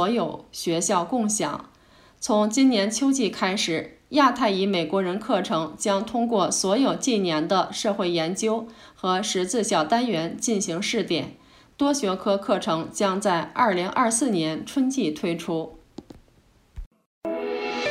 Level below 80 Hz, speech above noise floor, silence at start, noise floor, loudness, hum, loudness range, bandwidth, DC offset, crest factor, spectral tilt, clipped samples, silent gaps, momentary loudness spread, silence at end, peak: -56 dBFS; 35 dB; 0 s; -59 dBFS; -24 LUFS; none; 3 LU; 15.5 kHz; under 0.1%; 18 dB; -3.5 dB/octave; under 0.1%; 16.86-16.91 s, 17.06-17.21 s; 8 LU; 0 s; -6 dBFS